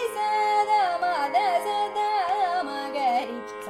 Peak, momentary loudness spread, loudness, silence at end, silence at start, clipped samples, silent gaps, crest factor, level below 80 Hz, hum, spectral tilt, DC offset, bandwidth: -12 dBFS; 6 LU; -25 LUFS; 0 s; 0 s; under 0.1%; none; 12 dB; -70 dBFS; none; -2 dB/octave; under 0.1%; 14.5 kHz